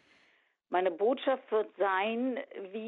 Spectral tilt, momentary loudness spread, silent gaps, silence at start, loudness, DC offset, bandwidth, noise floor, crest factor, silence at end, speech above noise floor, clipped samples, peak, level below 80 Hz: -7 dB/octave; 6 LU; none; 0.7 s; -32 LUFS; under 0.1%; 4.3 kHz; -69 dBFS; 18 dB; 0 s; 38 dB; under 0.1%; -14 dBFS; -88 dBFS